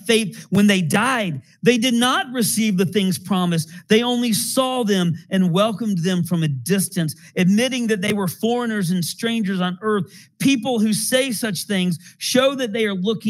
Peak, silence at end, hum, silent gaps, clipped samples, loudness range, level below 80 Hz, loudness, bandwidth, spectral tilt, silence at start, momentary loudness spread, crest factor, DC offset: -2 dBFS; 0 s; none; none; under 0.1%; 2 LU; -70 dBFS; -20 LUFS; 16.5 kHz; -4.5 dB/octave; 0.05 s; 5 LU; 16 dB; under 0.1%